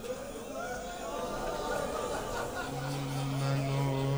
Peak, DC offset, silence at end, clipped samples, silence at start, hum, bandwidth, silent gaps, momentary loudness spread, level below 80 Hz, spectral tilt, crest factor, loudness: -20 dBFS; under 0.1%; 0 s; under 0.1%; 0 s; none; over 20 kHz; none; 8 LU; -50 dBFS; -5.5 dB/octave; 14 dB; -35 LUFS